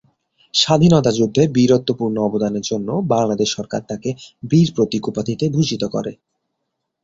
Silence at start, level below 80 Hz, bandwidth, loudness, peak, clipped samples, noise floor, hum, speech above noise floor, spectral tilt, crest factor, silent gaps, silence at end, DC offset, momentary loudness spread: 0.55 s; -50 dBFS; 7.8 kHz; -18 LUFS; -2 dBFS; under 0.1%; -76 dBFS; none; 59 dB; -6 dB/octave; 16 dB; none; 0.9 s; under 0.1%; 12 LU